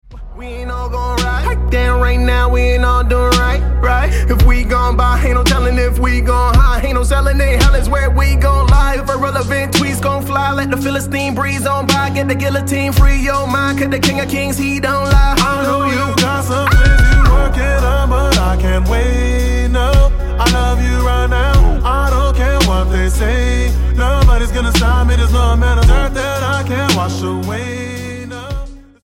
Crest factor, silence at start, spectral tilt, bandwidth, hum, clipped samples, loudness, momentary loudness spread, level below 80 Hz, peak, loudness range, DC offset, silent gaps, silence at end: 12 dB; 0.1 s; -5.5 dB/octave; 16 kHz; none; under 0.1%; -14 LUFS; 5 LU; -14 dBFS; 0 dBFS; 2 LU; under 0.1%; none; 0.25 s